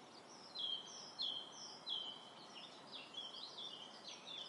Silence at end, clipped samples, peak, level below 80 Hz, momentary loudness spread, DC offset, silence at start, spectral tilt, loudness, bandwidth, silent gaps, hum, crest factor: 0 s; under 0.1%; -34 dBFS; under -90 dBFS; 11 LU; under 0.1%; 0 s; -1 dB/octave; -47 LUFS; 11.5 kHz; none; none; 18 dB